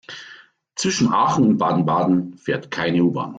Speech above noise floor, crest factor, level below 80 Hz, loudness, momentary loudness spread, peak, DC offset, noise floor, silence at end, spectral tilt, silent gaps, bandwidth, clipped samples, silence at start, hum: 28 dB; 14 dB; -58 dBFS; -19 LUFS; 12 LU; -6 dBFS; under 0.1%; -47 dBFS; 0 s; -5.5 dB/octave; none; 9.2 kHz; under 0.1%; 0.1 s; none